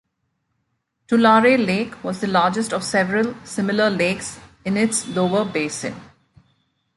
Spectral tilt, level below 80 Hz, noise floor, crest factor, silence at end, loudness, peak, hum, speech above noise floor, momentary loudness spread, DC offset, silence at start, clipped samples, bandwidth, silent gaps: -4.5 dB/octave; -58 dBFS; -73 dBFS; 18 dB; 0.9 s; -19 LUFS; -4 dBFS; none; 53 dB; 13 LU; under 0.1%; 1.1 s; under 0.1%; 11.5 kHz; none